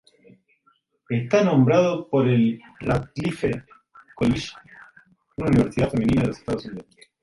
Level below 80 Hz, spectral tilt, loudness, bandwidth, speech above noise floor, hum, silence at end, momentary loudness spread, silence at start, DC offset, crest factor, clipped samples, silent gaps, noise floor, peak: -46 dBFS; -7.5 dB/octave; -22 LUFS; 11.5 kHz; 44 dB; none; 0.4 s; 13 LU; 1.1 s; under 0.1%; 18 dB; under 0.1%; none; -65 dBFS; -6 dBFS